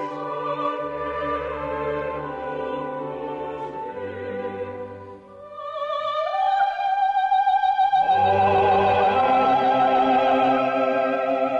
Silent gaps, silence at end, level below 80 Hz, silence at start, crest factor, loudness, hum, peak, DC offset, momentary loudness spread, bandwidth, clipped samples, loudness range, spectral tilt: none; 0 s; -54 dBFS; 0 s; 10 dB; -22 LUFS; none; -12 dBFS; under 0.1%; 13 LU; 7.2 kHz; under 0.1%; 12 LU; -6.5 dB/octave